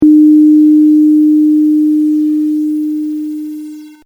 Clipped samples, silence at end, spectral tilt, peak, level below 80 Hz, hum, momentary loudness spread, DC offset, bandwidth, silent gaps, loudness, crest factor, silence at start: under 0.1%; 0.15 s; -8 dB/octave; 0 dBFS; -54 dBFS; none; 16 LU; under 0.1%; 0.7 kHz; none; -9 LUFS; 8 dB; 0 s